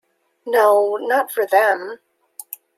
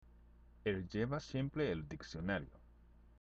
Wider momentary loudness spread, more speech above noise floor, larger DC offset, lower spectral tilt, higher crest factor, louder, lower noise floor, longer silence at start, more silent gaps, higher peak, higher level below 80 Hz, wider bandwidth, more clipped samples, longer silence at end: first, 19 LU vs 6 LU; about the same, 22 dB vs 23 dB; neither; second, -2 dB/octave vs -7 dB/octave; about the same, 18 dB vs 18 dB; first, -17 LUFS vs -41 LUFS; second, -39 dBFS vs -63 dBFS; first, 0.45 s vs 0.05 s; neither; first, -2 dBFS vs -24 dBFS; second, -78 dBFS vs -58 dBFS; first, 16.5 kHz vs 7.8 kHz; neither; first, 0.2 s vs 0.05 s